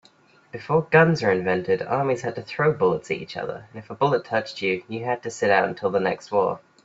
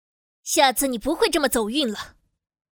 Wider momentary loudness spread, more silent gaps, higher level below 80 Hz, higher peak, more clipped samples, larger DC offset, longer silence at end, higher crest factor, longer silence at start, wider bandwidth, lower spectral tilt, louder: second, 12 LU vs 16 LU; neither; second, -62 dBFS vs -50 dBFS; first, -2 dBFS vs -6 dBFS; neither; neither; second, 0.25 s vs 0.65 s; about the same, 20 dB vs 18 dB; about the same, 0.55 s vs 0.45 s; second, 8 kHz vs over 20 kHz; first, -6 dB/octave vs -2 dB/octave; about the same, -23 LUFS vs -21 LUFS